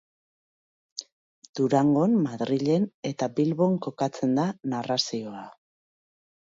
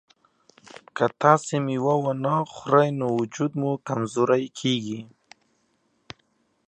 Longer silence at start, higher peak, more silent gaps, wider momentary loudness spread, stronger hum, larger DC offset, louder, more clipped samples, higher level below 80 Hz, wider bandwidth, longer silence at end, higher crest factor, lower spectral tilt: about the same, 0.95 s vs 0.95 s; second, -10 dBFS vs -2 dBFS; first, 1.12-1.42 s, 1.49-1.54 s, 2.94-3.03 s vs none; first, 18 LU vs 8 LU; neither; neither; about the same, -26 LUFS vs -24 LUFS; neither; about the same, -72 dBFS vs -70 dBFS; second, 7.8 kHz vs 9.6 kHz; second, 1 s vs 1.6 s; second, 18 dB vs 24 dB; about the same, -6 dB/octave vs -6 dB/octave